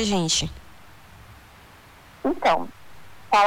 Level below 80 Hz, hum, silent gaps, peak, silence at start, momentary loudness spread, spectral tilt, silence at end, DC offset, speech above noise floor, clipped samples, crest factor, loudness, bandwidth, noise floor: -48 dBFS; none; none; -8 dBFS; 0 s; 16 LU; -3 dB/octave; 0 s; under 0.1%; 26 dB; under 0.1%; 16 dB; -23 LUFS; 19 kHz; -49 dBFS